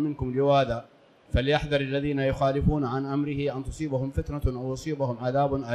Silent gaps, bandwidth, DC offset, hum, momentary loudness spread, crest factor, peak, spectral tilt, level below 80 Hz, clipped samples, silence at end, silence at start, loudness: none; 12 kHz; under 0.1%; none; 7 LU; 16 dB; -10 dBFS; -7 dB/octave; -38 dBFS; under 0.1%; 0 s; 0 s; -27 LUFS